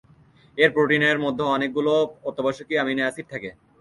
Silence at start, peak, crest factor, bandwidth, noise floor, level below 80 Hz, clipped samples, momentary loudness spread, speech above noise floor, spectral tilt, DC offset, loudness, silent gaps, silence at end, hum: 0.55 s; -4 dBFS; 20 dB; 11.5 kHz; -54 dBFS; -62 dBFS; under 0.1%; 15 LU; 32 dB; -5.5 dB/octave; under 0.1%; -22 LUFS; none; 0.3 s; none